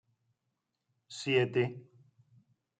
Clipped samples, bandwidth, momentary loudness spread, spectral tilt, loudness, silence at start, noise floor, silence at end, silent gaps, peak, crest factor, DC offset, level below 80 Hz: under 0.1%; 9.2 kHz; 20 LU; -5.5 dB/octave; -31 LUFS; 1.1 s; -84 dBFS; 0.95 s; none; -16 dBFS; 22 dB; under 0.1%; -80 dBFS